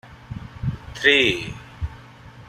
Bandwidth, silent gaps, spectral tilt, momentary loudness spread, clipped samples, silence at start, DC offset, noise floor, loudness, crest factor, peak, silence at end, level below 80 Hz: 14 kHz; none; -4.5 dB/octave; 22 LU; under 0.1%; 0.05 s; under 0.1%; -44 dBFS; -20 LUFS; 22 dB; -2 dBFS; 0.05 s; -42 dBFS